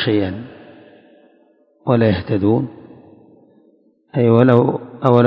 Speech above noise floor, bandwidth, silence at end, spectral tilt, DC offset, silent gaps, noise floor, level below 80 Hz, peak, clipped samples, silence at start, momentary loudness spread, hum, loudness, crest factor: 40 dB; 5.4 kHz; 0 s; -10 dB/octave; under 0.1%; none; -55 dBFS; -46 dBFS; 0 dBFS; under 0.1%; 0 s; 16 LU; none; -16 LUFS; 18 dB